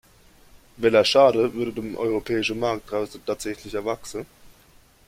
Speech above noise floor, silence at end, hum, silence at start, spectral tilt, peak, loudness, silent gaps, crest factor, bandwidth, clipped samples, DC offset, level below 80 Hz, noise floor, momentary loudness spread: 32 dB; 0.85 s; none; 0.8 s; -4.5 dB/octave; -4 dBFS; -23 LUFS; none; 20 dB; 16 kHz; under 0.1%; under 0.1%; -54 dBFS; -55 dBFS; 14 LU